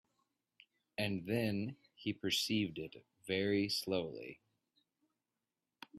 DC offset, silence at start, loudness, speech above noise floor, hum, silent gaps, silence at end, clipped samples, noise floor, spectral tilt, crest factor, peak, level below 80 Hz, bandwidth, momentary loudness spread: under 0.1%; 1 s; -38 LUFS; over 52 dB; none; none; 0 s; under 0.1%; under -90 dBFS; -4.5 dB/octave; 18 dB; -22 dBFS; -76 dBFS; 15.5 kHz; 16 LU